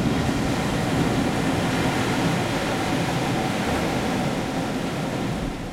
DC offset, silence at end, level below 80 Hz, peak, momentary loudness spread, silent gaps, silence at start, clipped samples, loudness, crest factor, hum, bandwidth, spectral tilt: under 0.1%; 0 s; -40 dBFS; -10 dBFS; 4 LU; none; 0 s; under 0.1%; -24 LUFS; 14 dB; none; 16.5 kHz; -5.5 dB/octave